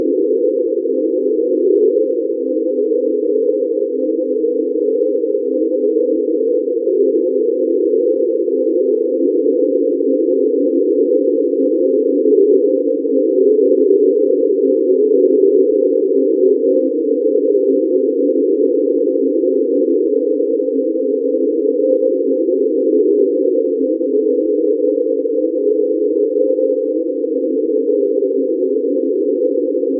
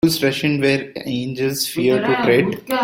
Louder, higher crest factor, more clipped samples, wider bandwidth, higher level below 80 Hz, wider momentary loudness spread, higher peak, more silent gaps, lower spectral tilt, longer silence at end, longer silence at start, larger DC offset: first, -15 LUFS vs -18 LUFS; about the same, 12 dB vs 16 dB; neither; second, 0.6 kHz vs 16.5 kHz; second, under -90 dBFS vs -54 dBFS; second, 5 LU vs 8 LU; about the same, -2 dBFS vs -2 dBFS; neither; first, -14 dB/octave vs -5 dB/octave; about the same, 0 s vs 0 s; about the same, 0 s vs 0.05 s; neither